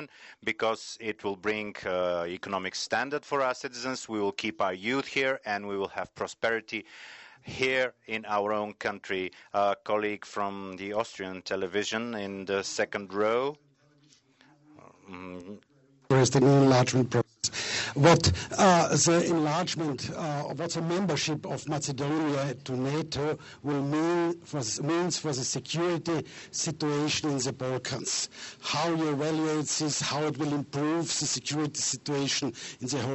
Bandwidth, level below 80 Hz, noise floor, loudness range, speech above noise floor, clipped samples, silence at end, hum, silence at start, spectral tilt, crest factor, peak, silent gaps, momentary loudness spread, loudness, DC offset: 8.4 kHz; -62 dBFS; -62 dBFS; 7 LU; 34 dB; under 0.1%; 0 s; none; 0 s; -4 dB/octave; 20 dB; -8 dBFS; none; 12 LU; -29 LUFS; under 0.1%